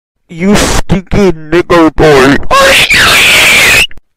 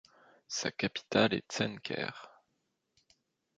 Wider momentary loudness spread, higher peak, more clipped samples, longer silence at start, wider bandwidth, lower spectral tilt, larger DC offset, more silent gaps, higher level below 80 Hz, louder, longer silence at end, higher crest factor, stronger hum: about the same, 9 LU vs 11 LU; first, 0 dBFS vs -12 dBFS; first, 0.4% vs under 0.1%; second, 0.3 s vs 0.5 s; first, 16.5 kHz vs 9.2 kHz; about the same, -3 dB/octave vs -4 dB/octave; neither; neither; first, -20 dBFS vs -70 dBFS; first, -5 LUFS vs -34 LUFS; second, 0.2 s vs 1.3 s; second, 6 dB vs 26 dB; neither